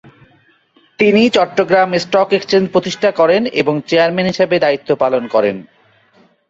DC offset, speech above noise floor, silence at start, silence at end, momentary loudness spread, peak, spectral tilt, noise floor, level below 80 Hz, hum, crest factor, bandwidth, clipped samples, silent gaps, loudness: under 0.1%; 40 dB; 1 s; 0.85 s; 4 LU; -2 dBFS; -5.5 dB/octave; -53 dBFS; -56 dBFS; none; 14 dB; 7.8 kHz; under 0.1%; none; -14 LUFS